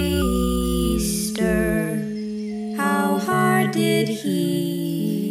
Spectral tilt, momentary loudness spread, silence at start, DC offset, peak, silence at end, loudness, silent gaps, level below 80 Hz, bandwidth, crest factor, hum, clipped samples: -5.5 dB/octave; 8 LU; 0 s; under 0.1%; -6 dBFS; 0 s; -22 LUFS; none; -34 dBFS; 16.5 kHz; 16 dB; none; under 0.1%